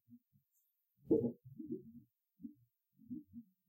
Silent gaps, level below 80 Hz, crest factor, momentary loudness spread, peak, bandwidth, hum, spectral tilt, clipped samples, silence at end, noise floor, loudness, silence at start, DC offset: none; -80 dBFS; 22 dB; 22 LU; -22 dBFS; 16 kHz; none; -12.5 dB/octave; under 0.1%; 0.25 s; -82 dBFS; -41 LUFS; 0.1 s; under 0.1%